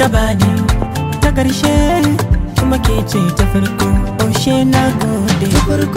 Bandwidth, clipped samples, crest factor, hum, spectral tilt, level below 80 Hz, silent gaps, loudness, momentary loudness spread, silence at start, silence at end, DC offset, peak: 16.5 kHz; under 0.1%; 12 dB; none; -5.5 dB/octave; -20 dBFS; none; -14 LUFS; 3 LU; 0 s; 0 s; under 0.1%; 0 dBFS